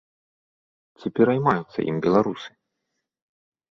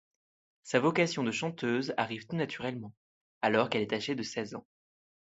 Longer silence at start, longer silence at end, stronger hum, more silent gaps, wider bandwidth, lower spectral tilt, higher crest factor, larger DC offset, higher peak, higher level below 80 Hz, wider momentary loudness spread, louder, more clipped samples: first, 1 s vs 0.65 s; first, 1.2 s vs 0.7 s; neither; second, none vs 2.97-3.41 s; second, 7 kHz vs 8.2 kHz; first, -8 dB/octave vs -5 dB/octave; about the same, 22 dB vs 24 dB; neither; first, -4 dBFS vs -10 dBFS; first, -62 dBFS vs -74 dBFS; first, 16 LU vs 11 LU; first, -22 LUFS vs -32 LUFS; neither